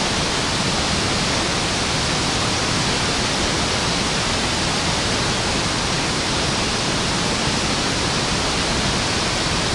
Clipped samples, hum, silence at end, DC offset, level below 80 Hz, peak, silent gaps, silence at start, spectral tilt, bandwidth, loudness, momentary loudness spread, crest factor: under 0.1%; none; 0 s; under 0.1%; -34 dBFS; -6 dBFS; none; 0 s; -3 dB/octave; 11.5 kHz; -19 LUFS; 1 LU; 14 dB